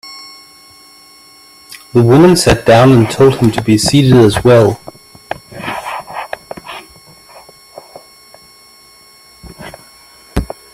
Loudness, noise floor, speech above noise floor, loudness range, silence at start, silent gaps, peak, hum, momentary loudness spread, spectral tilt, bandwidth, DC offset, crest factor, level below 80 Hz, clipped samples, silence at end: -10 LUFS; -42 dBFS; 35 dB; 21 LU; 0.05 s; none; 0 dBFS; none; 25 LU; -6 dB/octave; 15.5 kHz; under 0.1%; 14 dB; -34 dBFS; under 0.1%; 0.3 s